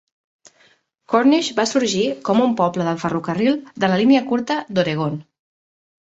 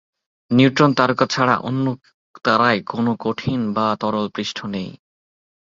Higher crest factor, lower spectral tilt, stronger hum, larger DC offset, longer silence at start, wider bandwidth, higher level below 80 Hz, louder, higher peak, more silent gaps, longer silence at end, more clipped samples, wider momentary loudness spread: about the same, 18 dB vs 20 dB; about the same, -5 dB/octave vs -6 dB/octave; neither; neither; first, 1.1 s vs 0.5 s; about the same, 8 kHz vs 7.6 kHz; about the same, -60 dBFS vs -56 dBFS; about the same, -19 LUFS vs -19 LUFS; about the same, -2 dBFS vs 0 dBFS; second, none vs 2.14-2.34 s; about the same, 0.8 s vs 0.85 s; neither; second, 7 LU vs 11 LU